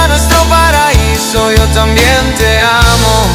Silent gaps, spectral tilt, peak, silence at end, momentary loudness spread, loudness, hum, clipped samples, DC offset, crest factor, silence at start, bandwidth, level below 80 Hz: none; -4 dB/octave; 0 dBFS; 0 s; 3 LU; -8 LUFS; none; 3%; under 0.1%; 8 dB; 0 s; 17 kHz; -14 dBFS